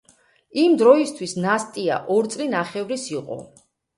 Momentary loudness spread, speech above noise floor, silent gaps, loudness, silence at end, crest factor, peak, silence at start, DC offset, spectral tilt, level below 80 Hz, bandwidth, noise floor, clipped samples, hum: 15 LU; 37 dB; none; -21 LUFS; 0.5 s; 20 dB; -2 dBFS; 0.55 s; under 0.1%; -5 dB/octave; -68 dBFS; 11.5 kHz; -57 dBFS; under 0.1%; none